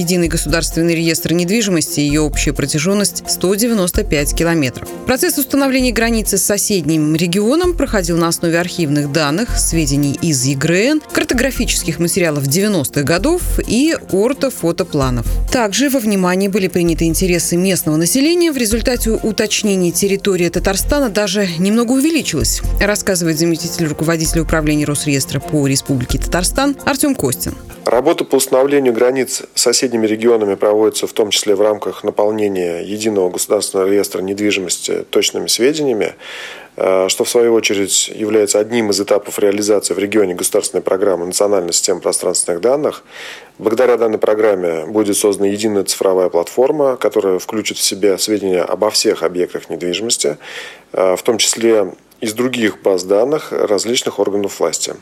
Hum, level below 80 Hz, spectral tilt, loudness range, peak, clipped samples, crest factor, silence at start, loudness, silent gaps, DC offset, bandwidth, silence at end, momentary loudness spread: none; -30 dBFS; -4 dB/octave; 2 LU; 0 dBFS; under 0.1%; 14 dB; 0 s; -15 LUFS; none; under 0.1%; over 20 kHz; 0 s; 5 LU